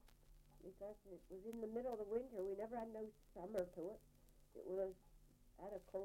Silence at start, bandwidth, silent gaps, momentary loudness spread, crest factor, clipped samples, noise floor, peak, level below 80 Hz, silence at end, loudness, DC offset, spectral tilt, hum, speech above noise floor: 0.05 s; 16.5 kHz; none; 14 LU; 20 dB; under 0.1%; -68 dBFS; -30 dBFS; -70 dBFS; 0 s; -50 LUFS; under 0.1%; -7 dB/octave; none; 19 dB